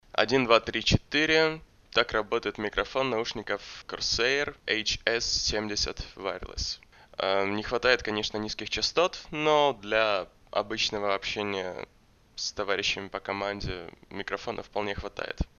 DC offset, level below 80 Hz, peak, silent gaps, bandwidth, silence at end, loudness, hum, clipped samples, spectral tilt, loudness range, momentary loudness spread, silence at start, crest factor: under 0.1%; -46 dBFS; -4 dBFS; none; 7.4 kHz; 0.15 s; -28 LUFS; none; under 0.1%; -3 dB/octave; 6 LU; 12 LU; 0.15 s; 26 dB